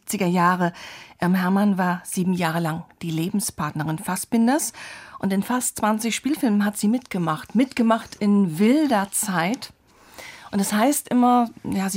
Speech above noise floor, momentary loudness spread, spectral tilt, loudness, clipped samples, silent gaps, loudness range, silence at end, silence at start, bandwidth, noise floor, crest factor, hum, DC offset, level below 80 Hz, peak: 23 dB; 10 LU; -5 dB/octave; -22 LUFS; under 0.1%; none; 3 LU; 0 s; 0.05 s; 16 kHz; -45 dBFS; 16 dB; none; under 0.1%; -60 dBFS; -6 dBFS